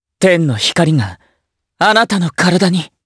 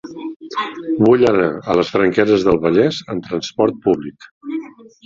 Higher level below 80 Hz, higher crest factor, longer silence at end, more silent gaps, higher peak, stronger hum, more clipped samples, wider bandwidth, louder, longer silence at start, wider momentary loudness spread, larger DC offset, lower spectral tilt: about the same, -52 dBFS vs -48 dBFS; about the same, 14 dB vs 16 dB; second, 0.2 s vs 0.4 s; second, none vs 0.36-0.40 s, 4.31-4.41 s; about the same, 0 dBFS vs -2 dBFS; neither; neither; first, 11 kHz vs 7.6 kHz; first, -13 LUFS vs -16 LUFS; first, 0.2 s vs 0.05 s; second, 4 LU vs 15 LU; neither; second, -5 dB/octave vs -6.5 dB/octave